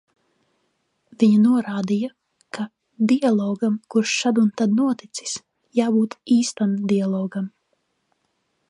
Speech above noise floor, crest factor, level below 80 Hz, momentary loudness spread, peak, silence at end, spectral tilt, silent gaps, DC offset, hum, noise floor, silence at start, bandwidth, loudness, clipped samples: 52 dB; 16 dB; -72 dBFS; 14 LU; -6 dBFS; 1.2 s; -5.5 dB/octave; none; under 0.1%; none; -71 dBFS; 1.2 s; 11 kHz; -21 LUFS; under 0.1%